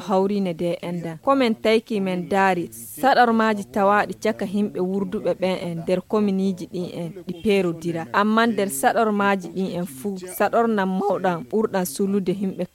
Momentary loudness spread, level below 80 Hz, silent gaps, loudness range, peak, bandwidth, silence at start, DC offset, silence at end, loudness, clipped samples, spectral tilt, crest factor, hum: 9 LU; -60 dBFS; none; 4 LU; -4 dBFS; 17 kHz; 0 s; under 0.1%; 0.1 s; -22 LUFS; under 0.1%; -5.5 dB/octave; 18 dB; none